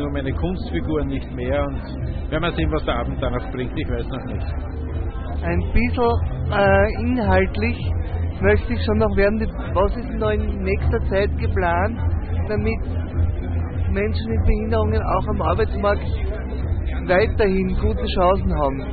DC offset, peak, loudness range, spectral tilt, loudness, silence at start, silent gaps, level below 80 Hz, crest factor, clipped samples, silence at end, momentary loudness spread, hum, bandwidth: under 0.1%; -4 dBFS; 5 LU; -12 dB/octave; -22 LUFS; 0 s; none; -26 dBFS; 16 dB; under 0.1%; 0 s; 8 LU; none; 4.8 kHz